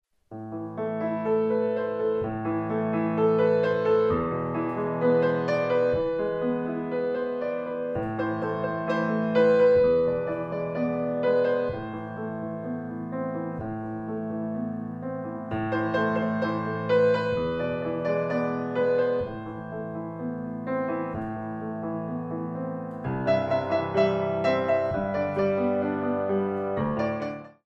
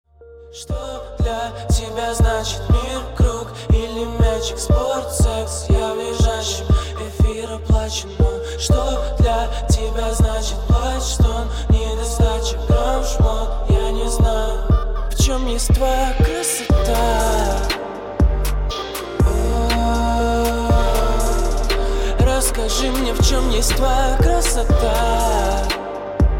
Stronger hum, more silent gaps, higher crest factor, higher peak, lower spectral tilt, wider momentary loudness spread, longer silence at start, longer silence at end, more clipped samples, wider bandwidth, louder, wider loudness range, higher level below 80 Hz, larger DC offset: neither; neither; about the same, 16 dB vs 12 dB; second, -12 dBFS vs -4 dBFS; first, -8.5 dB/octave vs -5 dB/octave; first, 11 LU vs 6 LU; about the same, 0.3 s vs 0.2 s; first, 0.2 s vs 0 s; neither; second, 6.6 kHz vs 17 kHz; second, -27 LUFS vs -19 LUFS; first, 7 LU vs 2 LU; second, -56 dBFS vs -20 dBFS; neither